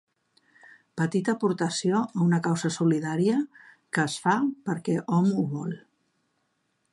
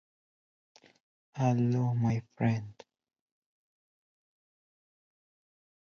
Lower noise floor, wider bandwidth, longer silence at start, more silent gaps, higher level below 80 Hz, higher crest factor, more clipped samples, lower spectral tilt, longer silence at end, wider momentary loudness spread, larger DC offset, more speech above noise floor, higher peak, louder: second, -74 dBFS vs under -90 dBFS; first, 11.5 kHz vs 6.8 kHz; second, 0.95 s vs 1.35 s; neither; second, -74 dBFS vs -68 dBFS; about the same, 16 dB vs 20 dB; neither; second, -6 dB/octave vs -8.5 dB/octave; second, 1.15 s vs 3.25 s; second, 7 LU vs 13 LU; neither; second, 49 dB vs over 61 dB; first, -10 dBFS vs -14 dBFS; first, -26 LUFS vs -30 LUFS